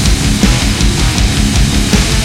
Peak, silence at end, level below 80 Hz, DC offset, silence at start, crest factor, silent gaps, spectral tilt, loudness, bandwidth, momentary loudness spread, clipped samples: 0 dBFS; 0 s; -14 dBFS; under 0.1%; 0 s; 10 dB; none; -4 dB/octave; -11 LUFS; 16.5 kHz; 1 LU; under 0.1%